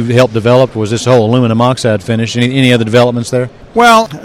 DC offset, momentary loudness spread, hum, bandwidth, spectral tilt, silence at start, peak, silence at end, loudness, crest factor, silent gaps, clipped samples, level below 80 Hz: under 0.1%; 7 LU; none; 15.5 kHz; -6 dB/octave; 0 s; 0 dBFS; 0 s; -10 LUFS; 10 dB; none; 1%; -44 dBFS